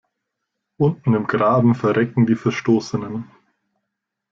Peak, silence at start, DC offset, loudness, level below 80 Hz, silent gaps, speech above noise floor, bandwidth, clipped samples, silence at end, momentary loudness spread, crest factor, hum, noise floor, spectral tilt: -4 dBFS; 0.8 s; under 0.1%; -19 LUFS; -58 dBFS; none; 62 dB; 7.4 kHz; under 0.1%; 1.1 s; 10 LU; 16 dB; none; -80 dBFS; -8 dB/octave